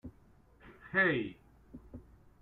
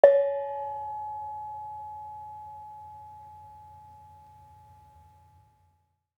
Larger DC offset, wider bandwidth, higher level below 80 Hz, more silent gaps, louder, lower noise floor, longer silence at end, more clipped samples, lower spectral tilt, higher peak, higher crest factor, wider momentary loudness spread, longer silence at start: neither; first, 4.3 kHz vs 3.8 kHz; first, -62 dBFS vs -72 dBFS; neither; about the same, -32 LUFS vs -32 LUFS; second, -63 dBFS vs -71 dBFS; second, 0.4 s vs 2.1 s; neither; first, -8 dB/octave vs -6.5 dB/octave; second, -16 dBFS vs -2 dBFS; second, 22 dB vs 30 dB; first, 26 LU vs 22 LU; about the same, 0.05 s vs 0.05 s